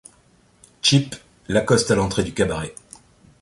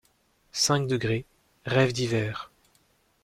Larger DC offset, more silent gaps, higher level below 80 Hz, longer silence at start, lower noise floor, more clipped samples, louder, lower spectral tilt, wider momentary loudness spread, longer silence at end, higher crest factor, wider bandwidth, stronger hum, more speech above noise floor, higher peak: neither; neither; first, -44 dBFS vs -56 dBFS; first, 0.85 s vs 0.55 s; second, -57 dBFS vs -67 dBFS; neither; first, -20 LUFS vs -26 LUFS; about the same, -4.5 dB/octave vs -4.5 dB/octave; about the same, 16 LU vs 15 LU; about the same, 0.7 s vs 0.8 s; about the same, 20 dB vs 20 dB; second, 11.5 kHz vs 15.5 kHz; neither; second, 37 dB vs 41 dB; first, -2 dBFS vs -10 dBFS